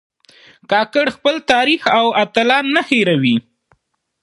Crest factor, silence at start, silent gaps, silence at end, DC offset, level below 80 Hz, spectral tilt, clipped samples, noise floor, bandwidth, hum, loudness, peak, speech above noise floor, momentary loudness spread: 16 dB; 0.7 s; none; 0.85 s; under 0.1%; -60 dBFS; -5 dB/octave; under 0.1%; -64 dBFS; 11.5 kHz; none; -15 LUFS; 0 dBFS; 49 dB; 4 LU